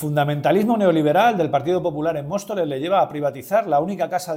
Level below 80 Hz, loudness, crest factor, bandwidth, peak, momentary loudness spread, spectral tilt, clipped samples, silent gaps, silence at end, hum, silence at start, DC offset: -60 dBFS; -20 LUFS; 14 dB; 16.5 kHz; -6 dBFS; 8 LU; -6.5 dB/octave; under 0.1%; none; 0 s; none; 0 s; under 0.1%